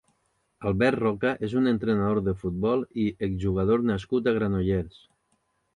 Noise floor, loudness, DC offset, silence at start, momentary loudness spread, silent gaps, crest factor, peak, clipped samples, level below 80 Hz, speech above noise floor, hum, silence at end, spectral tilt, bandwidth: -72 dBFS; -26 LUFS; under 0.1%; 0.6 s; 5 LU; none; 18 dB; -10 dBFS; under 0.1%; -46 dBFS; 47 dB; none; 0.85 s; -8.5 dB/octave; 10.5 kHz